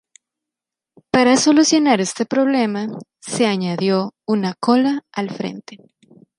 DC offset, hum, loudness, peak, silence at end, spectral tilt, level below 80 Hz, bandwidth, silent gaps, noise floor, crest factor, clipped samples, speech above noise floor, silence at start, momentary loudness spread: under 0.1%; none; -18 LUFS; -2 dBFS; 0.65 s; -4.5 dB/octave; -62 dBFS; 11.5 kHz; none; -87 dBFS; 16 dB; under 0.1%; 69 dB; 1.15 s; 14 LU